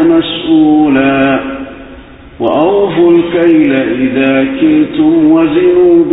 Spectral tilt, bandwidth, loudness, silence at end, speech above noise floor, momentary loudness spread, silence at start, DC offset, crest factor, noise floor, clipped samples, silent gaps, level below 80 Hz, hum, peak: -10 dB/octave; 4 kHz; -9 LUFS; 0 s; 24 dB; 6 LU; 0 s; under 0.1%; 8 dB; -32 dBFS; under 0.1%; none; -40 dBFS; none; 0 dBFS